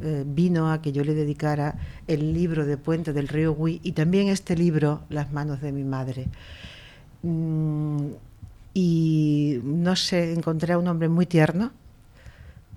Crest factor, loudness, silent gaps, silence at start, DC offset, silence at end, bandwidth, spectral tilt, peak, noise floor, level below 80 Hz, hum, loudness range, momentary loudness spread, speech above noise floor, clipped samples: 16 dB; -24 LUFS; none; 0 s; under 0.1%; 0 s; 12 kHz; -7 dB/octave; -8 dBFS; -48 dBFS; -46 dBFS; none; 6 LU; 10 LU; 24 dB; under 0.1%